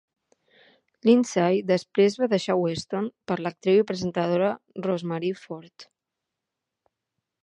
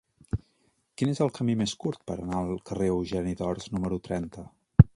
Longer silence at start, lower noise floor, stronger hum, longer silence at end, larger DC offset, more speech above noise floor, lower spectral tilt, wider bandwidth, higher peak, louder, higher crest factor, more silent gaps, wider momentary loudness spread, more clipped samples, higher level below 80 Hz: first, 1.05 s vs 0.35 s; first, -85 dBFS vs -70 dBFS; neither; first, 1.6 s vs 0.1 s; neither; first, 62 dB vs 41 dB; second, -6 dB/octave vs -7.5 dB/octave; about the same, 10.5 kHz vs 11 kHz; second, -6 dBFS vs 0 dBFS; first, -24 LUFS vs -30 LUFS; second, 20 dB vs 26 dB; neither; about the same, 10 LU vs 9 LU; neither; second, -68 dBFS vs -42 dBFS